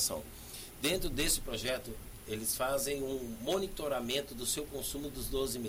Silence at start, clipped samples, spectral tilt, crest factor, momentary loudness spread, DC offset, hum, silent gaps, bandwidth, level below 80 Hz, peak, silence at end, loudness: 0 s; under 0.1%; -2.5 dB/octave; 16 dB; 11 LU; under 0.1%; none; none; 16 kHz; -48 dBFS; -20 dBFS; 0 s; -35 LUFS